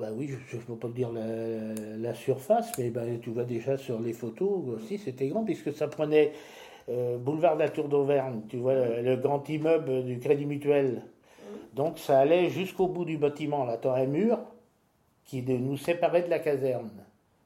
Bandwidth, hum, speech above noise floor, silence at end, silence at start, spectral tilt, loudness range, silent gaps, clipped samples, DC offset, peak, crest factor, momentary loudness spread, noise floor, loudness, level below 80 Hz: 16.5 kHz; none; 40 dB; 0.4 s; 0 s; -7 dB/octave; 4 LU; none; under 0.1%; under 0.1%; -10 dBFS; 18 dB; 11 LU; -68 dBFS; -29 LUFS; -72 dBFS